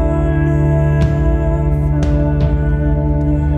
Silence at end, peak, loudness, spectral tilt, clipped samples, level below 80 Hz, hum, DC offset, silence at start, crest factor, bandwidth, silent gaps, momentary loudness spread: 0 s; -2 dBFS; -15 LUFS; -9.5 dB/octave; under 0.1%; -18 dBFS; none; under 0.1%; 0 s; 10 dB; 6.8 kHz; none; 2 LU